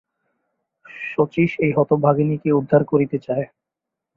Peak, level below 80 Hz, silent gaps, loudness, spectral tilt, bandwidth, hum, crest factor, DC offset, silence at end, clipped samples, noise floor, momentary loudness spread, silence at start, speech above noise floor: -2 dBFS; -60 dBFS; none; -19 LUFS; -10.5 dB/octave; 5.2 kHz; none; 18 dB; under 0.1%; 0.7 s; under 0.1%; -84 dBFS; 9 LU; 0.9 s; 66 dB